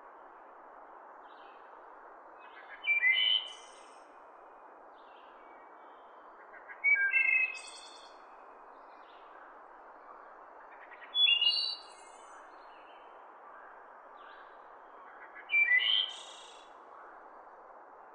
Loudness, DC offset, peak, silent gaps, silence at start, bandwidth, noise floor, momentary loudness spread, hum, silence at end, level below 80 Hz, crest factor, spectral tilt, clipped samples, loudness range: -27 LUFS; under 0.1%; -16 dBFS; none; 0.05 s; 10 kHz; -54 dBFS; 28 LU; none; 0.1 s; -82 dBFS; 20 dB; 2.5 dB/octave; under 0.1%; 20 LU